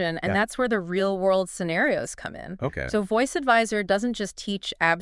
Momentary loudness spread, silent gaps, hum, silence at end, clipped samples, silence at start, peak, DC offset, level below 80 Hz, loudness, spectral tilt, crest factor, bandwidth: 10 LU; none; none; 0 s; under 0.1%; 0 s; -6 dBFS; under 0.1%; -52 dBFS; -25 LUFS; -4.5 dB/octave; 20 dB; 12 kHz